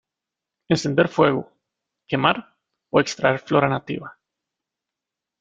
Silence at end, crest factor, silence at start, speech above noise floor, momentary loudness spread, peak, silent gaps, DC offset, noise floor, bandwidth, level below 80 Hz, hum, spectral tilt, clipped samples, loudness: 1.3 s; 22 dB; 0.7 s; 66 dB; 10 LU; -2 dBFS; none; under 0.1%; -86 dBFS; 9.2 kHz; -60 dBFS; none; -5.5 dB/octave; under 0.1%; -21 LUFS